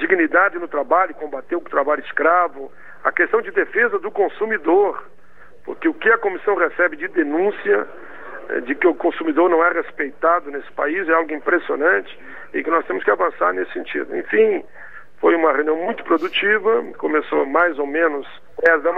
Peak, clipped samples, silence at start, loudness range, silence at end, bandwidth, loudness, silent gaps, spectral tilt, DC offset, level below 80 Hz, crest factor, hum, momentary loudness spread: 0 dBFS; under 0.1%; 0 s; 2 LU; 0 s; 5 kHz; -19 LUFS; none; -6.5 dB/octave; 1%; -64 dBFS; 18 dB; none; 10 LU